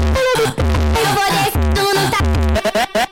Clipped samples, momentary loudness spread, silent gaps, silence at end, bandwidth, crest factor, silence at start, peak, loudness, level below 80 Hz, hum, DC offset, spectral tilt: under 0.1%; 2 LU; none; 0.05 s; 17 kHz; 8 dB; 0 s; -6 dBFS; -15 LUFS; -20 dBFS; none; under 0.1%; -4.5 dB/octave